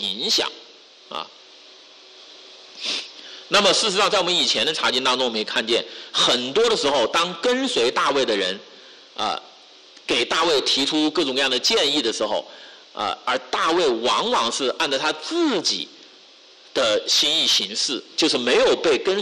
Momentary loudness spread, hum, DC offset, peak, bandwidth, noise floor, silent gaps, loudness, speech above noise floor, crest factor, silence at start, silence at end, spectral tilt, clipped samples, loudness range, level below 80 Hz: 11 LU; none; under 0.1%; -8 dBFS; 13.5 kHz; -49 dBFS; none; -20 LUFS; 28 dB; 14 dB; 0 s; 0 s; -1.5 dB/octave; under 0.1%; 3 LU; -60 dBFS